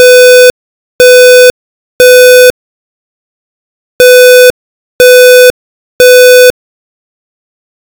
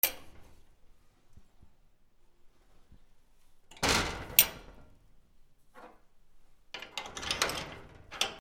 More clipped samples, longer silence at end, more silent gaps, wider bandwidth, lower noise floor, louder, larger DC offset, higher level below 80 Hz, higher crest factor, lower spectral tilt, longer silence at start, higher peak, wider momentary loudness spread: first, 30% vs under 0.1%; first, 1.45 s vs 0 s; first, 0.50-0.99 s, 1.50-1.99 s, 2.50-3.99 s, 4.50-4.99 s, 5.50-5.99 s vs none; about the same, over 20 kHz vs over 20 kHz; first, under -90 dBFS vs -61 dBFS; first, -2 LUFS vs -29 LUFS; first, 0.3% vs under 0.1%; first, -42 dBFS vs -54 dBFS; second, 4 dB vs 36 dB; about the same, 0 dB/octave vs -1 dB/octave; about the same, 0 s vs 0.05 s; about the same, 0 dBFS vs -2 dBFS; second, 6 LU vs 25 LU